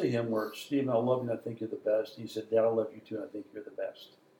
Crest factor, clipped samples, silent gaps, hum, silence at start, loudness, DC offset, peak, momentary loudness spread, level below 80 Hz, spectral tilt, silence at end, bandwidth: 16 dB; under 0.1%; none; none; 0 s; -33 LUFS; under 0.1%; -16 dBFS; 12 LU; -82 dBFS; -7 dB/octave; 0.35 s; 17.5 kHz